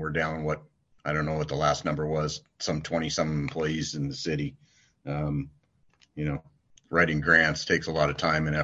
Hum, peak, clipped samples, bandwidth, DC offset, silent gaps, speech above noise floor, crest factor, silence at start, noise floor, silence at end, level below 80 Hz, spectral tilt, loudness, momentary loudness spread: none; -6 dBFS; under 0.1%; 8 kHz; under 0.1%; none; 37 dB; 22 dB; 0 s; -65 dBFS; 0 s; -48 dBFS; -5 dB/octave; -28 LUFS; 12 LU